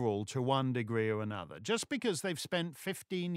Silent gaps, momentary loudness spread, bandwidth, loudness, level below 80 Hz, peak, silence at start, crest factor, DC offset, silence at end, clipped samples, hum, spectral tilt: none; 7 LU; 16 kHz; -35 LUFS; -76 dBFS; -18 dBFS; 0 s; 18 dB; under 0.1%; 0 s; under 0.1%; none; -5 dB/octave